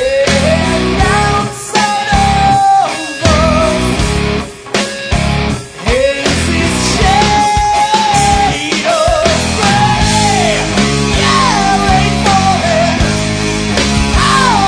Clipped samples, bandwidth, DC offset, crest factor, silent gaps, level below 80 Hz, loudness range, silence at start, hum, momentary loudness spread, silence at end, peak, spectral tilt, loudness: under 0.1%; 11 kHz; under 0.1%; 10 dB; none; -22 dBFS; 3 LU; 0 s; none; 6 LU; 0 s; 0 dBFS; -4 dB/octave; -11 LUFS